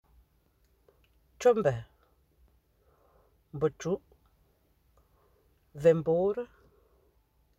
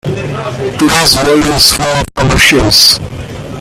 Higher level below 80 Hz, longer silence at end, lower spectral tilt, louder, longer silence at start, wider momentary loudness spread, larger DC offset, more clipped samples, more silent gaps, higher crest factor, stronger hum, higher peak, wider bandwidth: second, -64 dBFS vs -26 dBFS; first, 1.15 s vs 0 s; first, -7 dB/octave vs -3 dB/octave; second, -29 LUFS vs -8 LUFS; first, 1.4 s vs 0.05 s; first, 18 LU vs 13 LU; neither; second, under 0.1% vs 0.7%; neither; first, 22 dB vs 10 dB; neither; second, -12 dBFS vs 0 dBFS; second, 8.2 kHz vs over 20 kHz